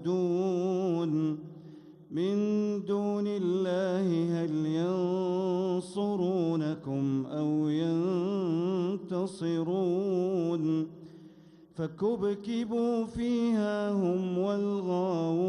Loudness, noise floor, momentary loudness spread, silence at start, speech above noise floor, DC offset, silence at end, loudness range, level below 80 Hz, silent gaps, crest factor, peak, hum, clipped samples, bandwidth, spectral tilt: -30 LUFS; -55 dBFS; 4 LU; 0 s; 26 dB; under 0.1%; 0 s; 2 LU; -68 dBFS; none; 12 dB; -18 dBFS; none; under 0.1%; 10.5 kHz; -8 dB/octave